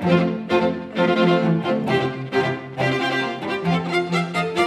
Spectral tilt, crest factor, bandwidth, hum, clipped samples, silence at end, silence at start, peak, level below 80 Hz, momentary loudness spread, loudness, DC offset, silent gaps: -6.5 dB/octave; 16 dB; 12 kHz; none; under 0.1%; 0 s; 0 s; -4 dBFS; -58 dBFS; 6 LU; -21 LUFS; under 0.1%; none